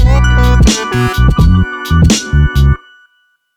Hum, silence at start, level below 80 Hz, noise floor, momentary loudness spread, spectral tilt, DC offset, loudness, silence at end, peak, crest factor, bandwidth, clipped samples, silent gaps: none; 0 s; -12 dBFS; -57 dBFS; 4 LU; -5.5 dB/octave; under 0.1%; -11 LUFS; 0.8 s; 0 dBFS; 10 dB; 14.5 kHz; under 0.1%; none